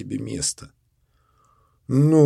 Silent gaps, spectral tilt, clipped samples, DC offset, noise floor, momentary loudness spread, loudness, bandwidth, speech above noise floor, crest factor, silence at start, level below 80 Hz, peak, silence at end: none; -6.5 dB/octave; under 0.1%; under 0.1%; -65 dBFS; 20 LU; -23 LUFS; 12.5 kHz; 46 dB; 18 dB; 0 s; -54 dBFS; -4 dBFS; 0 s